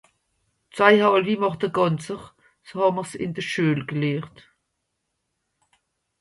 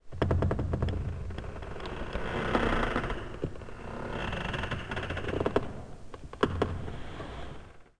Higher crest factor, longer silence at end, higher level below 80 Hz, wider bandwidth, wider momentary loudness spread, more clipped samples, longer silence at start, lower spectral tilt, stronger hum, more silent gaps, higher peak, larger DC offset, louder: about the same, 24 dB vs 22 dB; first, 1.9 s vs 0 s; second, -64 dBFS vs -40 dBFS; about the same, 11.5 kHz vs 10.5 kHz; first, 18 LU vs 14 LU; neither; first, 0.75 s vs 0.05 s; about the same, -6 dB/octave vs -7 dB/octave; neither; neither; first, -2 dBFS vs -12 dBFS; second, under 0.1% vs 0.2%; first, -22 LUFS vs -34 LUFS